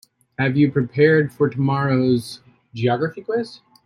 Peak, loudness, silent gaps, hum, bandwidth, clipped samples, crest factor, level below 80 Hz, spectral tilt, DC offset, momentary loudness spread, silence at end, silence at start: -4 dBFS; -20 LUFS; none; none; 12.5 kHz; under 0.1%; 16 dB; -58 dBFS; -8 dB/octave; under 0.1%; 19 LU; 0.3 s; 0.4 s